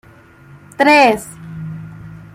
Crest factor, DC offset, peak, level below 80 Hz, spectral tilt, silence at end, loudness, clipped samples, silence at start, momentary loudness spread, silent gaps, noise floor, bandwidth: 16 dB; under 0.1%; -2 dBFS; -52 dBFS; -4.5 dB/octave; 0.2 s; -12 LUFS; under 0.1%; 0.8 s; 24 LU; none; -43 dBFS; 16 kHz